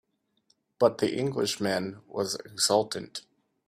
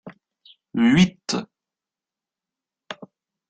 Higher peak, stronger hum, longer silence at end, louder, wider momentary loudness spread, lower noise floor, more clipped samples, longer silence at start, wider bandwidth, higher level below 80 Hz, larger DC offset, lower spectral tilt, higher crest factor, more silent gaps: about the same, -8 dBFS vs -6 dBFS; neither; about the same, 0.5 s vs 0.55 s; second, -28 LUFS vs -20 LUFS; second, 12 LU vs 22 LU; second, -71 dBFS vs -90 dBFS; neither; first, 0.8 s vs 0.05 s; first, 15.5 kHz vs 9 kHz; second, -70 dBFS vs -56 dBFS; neither; second, -3.5 dB/octave vs -5.5 dB/octave; about the same, 20 dB vs 20 dB; neither